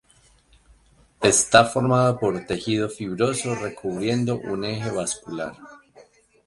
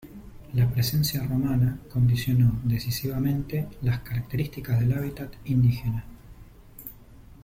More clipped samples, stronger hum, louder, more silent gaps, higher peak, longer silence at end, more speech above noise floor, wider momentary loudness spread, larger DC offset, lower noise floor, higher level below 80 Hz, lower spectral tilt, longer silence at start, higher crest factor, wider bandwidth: neither; neither; first, -22 LUFS vs -26 LUFS; neither; first, 0 dBFS vs -12 dBFS; first, 0.7 s vs 0 s; first, 35 dB vs 24 dB; about the same, 12 LU vs 14 LU; neither; first, -58 dBFS vs -48 dBFS; second, -54 dBFS vs -44 dBFS; second, -4 dB/octave vs -6.5 dB/octave; first, 1.2 s vs 0.05 s; first, 24 dB vs 14 dB; second, 11.5 kHz vs 16.5 kHz